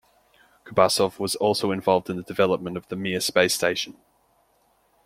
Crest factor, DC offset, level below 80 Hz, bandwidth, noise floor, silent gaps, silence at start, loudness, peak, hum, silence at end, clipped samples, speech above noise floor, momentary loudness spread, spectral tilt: 22 dB; under 0.1%; -62 dBFS; 16.5 kHz; -65 dBFS; none; 0.65 s; -23 LUFS; -2 dBFS; none; 1.15 s; under 0.1%; 41 dB; 10 LU; -3.5 dB/octave